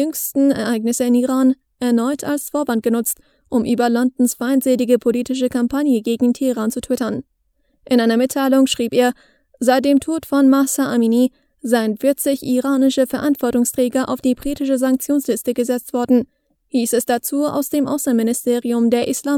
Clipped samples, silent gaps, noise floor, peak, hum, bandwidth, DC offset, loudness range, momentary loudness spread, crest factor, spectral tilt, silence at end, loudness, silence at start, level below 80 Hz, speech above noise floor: under 0.1%; none; -64 dBFS; 0 dBFS; none; 19 kHz; under 0.1%; 3 LU; 6 LU; 16 dB; -4 dB/octave; 0 s; -18 LUFS; 0 s; -54 dBFS; 47 dB